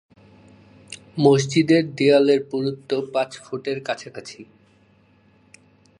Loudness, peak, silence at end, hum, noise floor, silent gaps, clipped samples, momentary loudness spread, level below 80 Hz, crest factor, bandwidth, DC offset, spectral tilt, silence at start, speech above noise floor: -20 LUFS; -4 dBFS; 1.55 s; none; -57 dBFS; none; under 0.1%; 20 LU; -66 dBFS; 20 dB; 11 kHz; under 0.1%; -6 dB/octave; 0.9 s; 37 dB